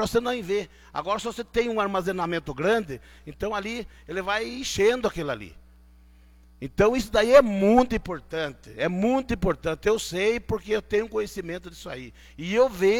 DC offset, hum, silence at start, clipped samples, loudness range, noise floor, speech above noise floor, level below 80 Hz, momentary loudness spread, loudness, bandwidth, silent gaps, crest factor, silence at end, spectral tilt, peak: under 0.1%; none; 0 s; under 0.1%; 6 LU; -53 dBFS; 28 dB; -46 dBFS; 16 LU; -25 LUFS; 17.5 kHz; none; 22 dB; 0 s; -5 dB/octave; -2 dBFS